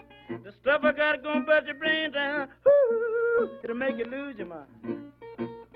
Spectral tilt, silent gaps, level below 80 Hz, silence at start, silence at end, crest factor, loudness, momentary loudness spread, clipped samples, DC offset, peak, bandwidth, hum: -7 dB/octave; none; -66 dBFS; 0.3 s; 0.1 s; 18 dB; -26 LUFS; 18 LU; under 0.1%; under 0.1%; -10 dBFS; 5 kHz; none